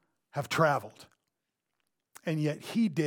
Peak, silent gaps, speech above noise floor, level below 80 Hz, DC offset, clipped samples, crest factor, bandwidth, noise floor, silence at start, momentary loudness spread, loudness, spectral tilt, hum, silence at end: -12 dBFS; none; 55 dB; -76 dBFS; under 0.1%; under 0.1%; 20 dB; 18.5 kHz; -85 dBFS; 0.35 s; 13 LU; -31 LUFS; -6 dB/octave; none; 0 s